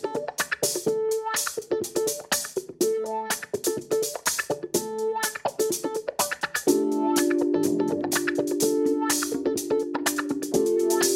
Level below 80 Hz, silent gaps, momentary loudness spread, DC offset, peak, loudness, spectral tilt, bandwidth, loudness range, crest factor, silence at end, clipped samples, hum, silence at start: -66 dBFS; none; 5 LU; under 0.1%; -8 dBFS; -26 LUFS; -2.5 dB/octave; 16.5 kHz; 3 LU; 18 dB; 0 s; under 0.1%; none; 0 s